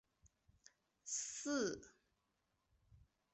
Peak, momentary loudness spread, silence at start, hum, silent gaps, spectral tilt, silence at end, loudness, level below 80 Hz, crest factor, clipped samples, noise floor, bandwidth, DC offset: -30 dBFS; 13 LU; 0.25 s; none; none; -2.5 dB/octave; 0.35 s; -43 LUFS; -78 dBFS; 20 dB; under 0.1%; -85 dBFS; 8.4 kHz; under 0.1%